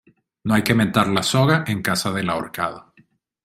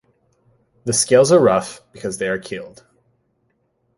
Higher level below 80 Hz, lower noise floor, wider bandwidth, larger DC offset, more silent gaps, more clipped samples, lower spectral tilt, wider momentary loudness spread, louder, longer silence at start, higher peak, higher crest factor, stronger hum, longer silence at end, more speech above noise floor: about the same, -52 dBFS vs -56 dBFS; second, -58 dBFS vs -67 dBFS; first, 16 kHz vs 11.5 kHz; neither; neither; neither; about the same, -5 dB/octave vs -4 dB/octave; second, 9 LU vs 19 LU; second, -20 LUFS vs -16 LUFS; second, 0.45 s vs 0.85 s; about the same, -2 dBFS vs -2 dBFS; about the same, 20 dB vs 18 dB; neither; second, 0.65 s vs 1.3 s; second, 38 dB vs 49 dB